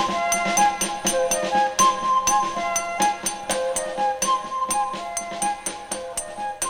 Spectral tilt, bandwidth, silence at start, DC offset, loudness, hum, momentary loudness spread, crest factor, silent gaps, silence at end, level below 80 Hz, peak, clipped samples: -1.5 dB/octave; over 20 kHz; 0 s; under 0.1%; -22 LUFS; none; 10 LU; 18 dB; none; 0 s; -52 dBFS; -6 dBFS; under 0.1%